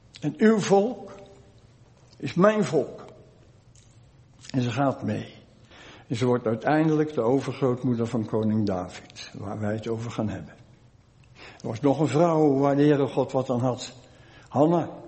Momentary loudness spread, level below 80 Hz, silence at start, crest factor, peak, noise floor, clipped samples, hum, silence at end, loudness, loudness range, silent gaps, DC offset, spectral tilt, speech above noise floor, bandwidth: 17 LU; -62 dBFS; 0.2 s; 22 dB; -4 dBFS; -55 dBFS; under 0.1%; none; 0 s; -25 LUFS; 7 LU; none; under 0.1%; -7 dB/octave; 31 dB; 8.4 kHz